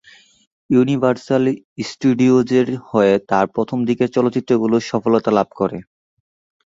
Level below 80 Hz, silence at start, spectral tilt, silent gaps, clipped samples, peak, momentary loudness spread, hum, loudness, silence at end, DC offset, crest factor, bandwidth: -56 dBFS; 0.7 s; -7 dB/octave; 1.65-1.76 s; under 0.1%; -2 dBFS; 7 LU; none; -17 LUFS; 0.85 s; under 0.1%; 16 dB; 7.8 kHz